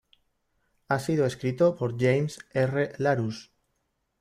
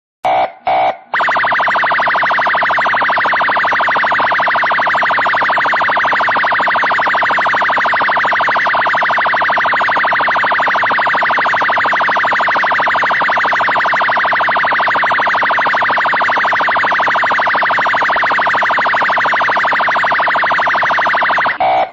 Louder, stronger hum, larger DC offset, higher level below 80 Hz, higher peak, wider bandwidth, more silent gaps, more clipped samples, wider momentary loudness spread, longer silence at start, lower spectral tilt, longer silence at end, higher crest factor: second, -27 LUFS vs -12 LUFS; neither; neither; second, -64 dBFS vs -54 dBFS; second, -10 dBFS vs -6 dBFS; first, 15 kHz vs 7.8 kHz; neither; neither; first, 6 LU vs 0 LU; first, 0.9 s vs 0.25 s; first, -7 dB/octave vs -3.5 dB/octave; first, 0.8 s vs 0 s; first, 18 dB vs 8 dB